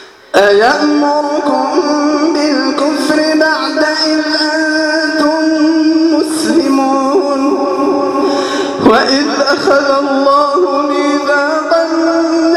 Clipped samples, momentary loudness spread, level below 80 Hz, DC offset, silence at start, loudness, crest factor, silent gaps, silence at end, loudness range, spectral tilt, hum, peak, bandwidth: under 0.1%; 3 LU; -54 dBFS; under 0.1%; 0 s; -11 LUFS; 10 dB; none; 0 s; 1 LU; -3 dB/octave; none; 0 dBFS; 13 kHz